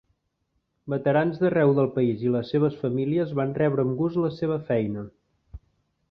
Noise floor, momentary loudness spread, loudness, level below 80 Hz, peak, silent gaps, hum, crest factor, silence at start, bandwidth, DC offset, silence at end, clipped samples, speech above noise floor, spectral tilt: -75 dBFS; 9 LU; -24 LUFS; -58 dBFS; -10 dBFS; none; none; 16 dB; 0.85 s; 5.6 kHz; under 0.1%; 0.55 s; under 0.1%; 51 dB; -10.5 dB/octave